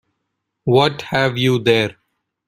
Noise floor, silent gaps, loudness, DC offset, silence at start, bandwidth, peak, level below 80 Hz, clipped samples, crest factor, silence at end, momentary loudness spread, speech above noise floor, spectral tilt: -75 dBFS; none; -17 LUFS; under 0.1%; 0.65 s; 15.5 kHz; -2 dBFS; -54 dBFS; under 0.1%; 18 dB; 0.55 s; 7 LU; 59 dB; -6 dB/octave